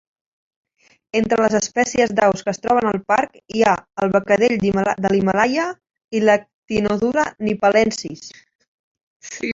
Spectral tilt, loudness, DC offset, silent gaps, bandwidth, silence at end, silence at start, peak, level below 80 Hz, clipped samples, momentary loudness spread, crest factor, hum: -5 dB/octave; -18 LUFS; under 0.1%; 6.04-6.08 s, 6.54-6.63 s, 8.55-8.59 s, 8.68-8.95 s, 9.03-9.20 s; 7.8 kHz; 0 s; 1.15 s; -2 dBFS; -52 dBFS; under 0.1%; 10 LU; 18 dB; none